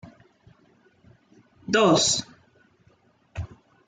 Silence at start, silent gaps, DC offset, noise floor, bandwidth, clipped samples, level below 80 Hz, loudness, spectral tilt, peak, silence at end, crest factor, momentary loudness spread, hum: 0.05 s; none; under 0.1%; -62 dBFS; 9.6 kHz; under 0.1%; -56 dBFS; -21 LUFS; -3 dB/octave; -8 dBFS; 0.4 s; 20 dB; 25 LU; none